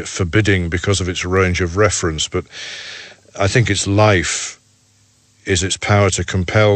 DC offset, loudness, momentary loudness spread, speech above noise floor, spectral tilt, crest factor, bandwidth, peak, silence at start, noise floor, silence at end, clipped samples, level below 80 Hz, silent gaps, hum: under 0.1%; -16 LUFS; 15 LU; 39 dB; -4.5 dB/octave; 16 dB; 8.8 kHz; 0 dBFS; 0 s; -55 dBFS; 0 s; under 0.1%; -38 dBFS; none; none